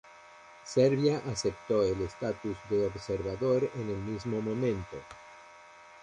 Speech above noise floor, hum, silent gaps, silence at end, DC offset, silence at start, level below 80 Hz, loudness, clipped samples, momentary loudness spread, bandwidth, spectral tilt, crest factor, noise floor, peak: 23 dB; none; none; 0 s; under 0.1%; 0.05 s; -56 dBFS; -31 LUFS; under 0.1%; 21 LU; 10.5 kHz; -6 dB/octave; 20 dB; -53 dBFS; -12 dBFS